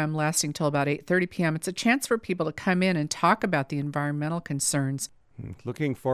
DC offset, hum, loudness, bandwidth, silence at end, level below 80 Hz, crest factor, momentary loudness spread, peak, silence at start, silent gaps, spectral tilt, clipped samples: under 0.1%; none; -26 LUFS; 16 kHz; 0 s; -60 dBFS; 20 dB; 8 LU; -6 dBFS; 0 s; none; -4.5 dB/octave; under 0.1%